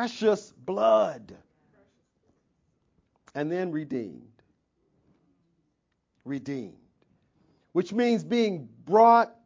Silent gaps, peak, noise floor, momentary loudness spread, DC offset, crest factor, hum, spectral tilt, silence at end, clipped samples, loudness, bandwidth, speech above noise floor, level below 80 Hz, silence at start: none; -6 dBFS; -76 dBFS; 19 LU; under 0.1%; 22 dB; none; -6 dB/octave; 0.2 s; under 0.1%; -26 LUFS; 7.6 kHz; 51 dB; -74 dBFS; 0 s